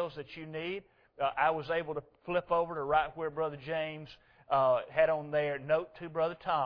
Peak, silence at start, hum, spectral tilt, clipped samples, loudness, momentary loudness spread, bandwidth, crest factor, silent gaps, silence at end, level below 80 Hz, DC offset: -14 dBFS; 0 s; none; -8 dB/octave; under 0.1%; -33 LUFS; 12 LU; 5.4 kHz; 18 dB; none; 0 s; -64 dBFS; under 0.1%